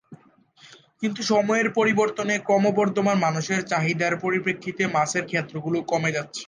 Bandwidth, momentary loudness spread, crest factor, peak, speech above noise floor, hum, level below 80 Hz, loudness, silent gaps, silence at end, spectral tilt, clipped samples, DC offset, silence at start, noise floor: 10 kHz; 7 LU; 16 dB; -8 dBFS; 32 dB; none; -70 dBFS; -23 LUFS; none; 0.05 s; -5 dB/octave; under 0.1%; under 0.1%; 0.1 s; -55 dBFS